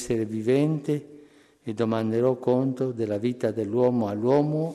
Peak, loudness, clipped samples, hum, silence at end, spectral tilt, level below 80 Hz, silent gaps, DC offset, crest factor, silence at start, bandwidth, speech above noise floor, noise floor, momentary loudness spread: -10 dBFS; -25 LUFS; under 0.1%; none; 0 s; -8 dB/octave; -62 dBFS; none; under 0.1%; 14 dB; 0 s; 13 kHz; 29 dB; -53 dBFS; 6 LU